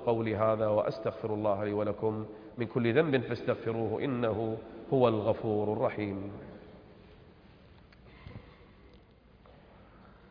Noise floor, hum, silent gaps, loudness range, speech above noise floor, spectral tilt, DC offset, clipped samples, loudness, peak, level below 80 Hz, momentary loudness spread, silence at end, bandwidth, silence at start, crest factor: -59 dBFS; none; none; 9 LU; 28 dB; -6.5 dB/octave; under 0.1%; under 0.1%; -31 LUFS; -12 dBFS; -62 dBFS; 20 LU; 0.2 s; 5.2 kHz; 0 s; 20 dB